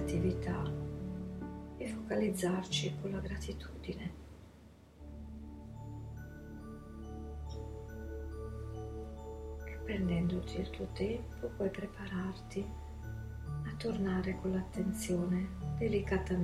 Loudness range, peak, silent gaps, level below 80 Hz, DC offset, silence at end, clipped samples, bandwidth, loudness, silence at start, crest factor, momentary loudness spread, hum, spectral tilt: 10 LU; -20 dBFS; none; -48 dBFS; under 0.1%; 0 s; under 0.1%; 14 kHz; -39 LUFS; 0 s; 18 dB; 14 LU; none; -6 dB/octave